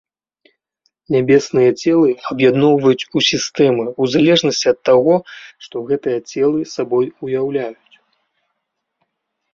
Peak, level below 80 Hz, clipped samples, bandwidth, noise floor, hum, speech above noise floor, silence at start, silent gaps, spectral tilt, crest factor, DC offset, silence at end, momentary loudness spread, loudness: -2 dBFS; -58 dBFS; under 0.1%; 7.6 kHz; -75 dBFS; none; 60 dB; 1.1 s; none; -5 dB/octave; 16 dB; under 0.1%; 1.8 s; 9 LU; -15 LUFS